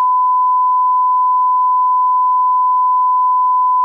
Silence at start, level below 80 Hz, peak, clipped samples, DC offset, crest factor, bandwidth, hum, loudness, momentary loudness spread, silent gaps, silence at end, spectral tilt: 0 s; under -90 dBFS; -10 dBFS; under 0.1%; under 0.1%; 4 dB; 1.2 kHz; none; -13 LUFS; 0 LU; none; 0 s; 0 dB/octave